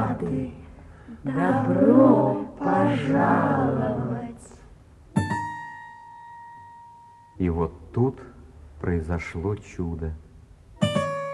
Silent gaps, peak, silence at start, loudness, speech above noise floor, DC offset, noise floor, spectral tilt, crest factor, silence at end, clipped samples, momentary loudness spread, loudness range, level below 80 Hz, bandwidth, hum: none; -4 dBFS; 0 s; -24 LUFS; 26 dB; under 0.1%; -49 dBFS; -8 dB/octave; 22 dB; 0 s; under 0.1%; 24 LU; 11 LU; -46 dBFS; 11.5 kHz; none